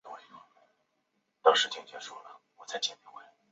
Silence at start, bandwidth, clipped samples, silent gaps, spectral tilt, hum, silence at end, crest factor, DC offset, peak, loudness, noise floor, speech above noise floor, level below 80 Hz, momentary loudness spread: 0.05 s; 8 kHz; under 0.1%; none; 3.5 dB/octave; none; 0.3 s; 28 dB; under 0.1%; -6 dBFS; -29 LUFS; -78 dBFS; 43 dB; under -90 dBFS; 25 LU